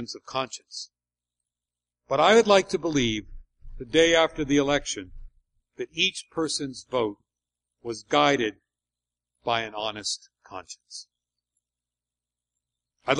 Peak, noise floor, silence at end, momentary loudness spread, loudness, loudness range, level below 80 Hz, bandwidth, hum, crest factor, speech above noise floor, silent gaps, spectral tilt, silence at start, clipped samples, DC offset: -6 dBFS; under -90 dBFS; 0 s; 21 LU; -24 LUFS; 11 LU; -50 dBFS; 11 kHz; 60 Hz at -60 dBFS; 22 dB; over 65 dB; none; -3.5 dB/octave; 0 s; under 0.1%; under 0.1%